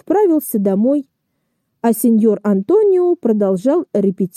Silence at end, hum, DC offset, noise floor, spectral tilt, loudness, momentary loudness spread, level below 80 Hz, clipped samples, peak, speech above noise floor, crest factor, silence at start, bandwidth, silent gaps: 0.1 s; none; under 0.1%; -70 dBFS; -8 dB/octave; -15 LUFS; 5 LU; -66 dBFS; under 0.1%; -4 dBFS; 55 dB; 10 dB; 0.1 s; 15 kHz; none